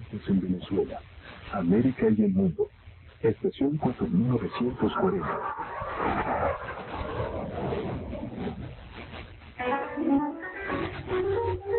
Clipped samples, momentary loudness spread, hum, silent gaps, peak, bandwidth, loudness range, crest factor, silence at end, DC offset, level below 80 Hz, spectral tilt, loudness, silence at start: under 0.1%; 13 LU; none; none; -12 dBFS; 4.4 kHz; 6 LU; 16 dB; 0 s; under 0.1%; -48 dBFS; -7 dB/octave; -29 LUFS; 0 s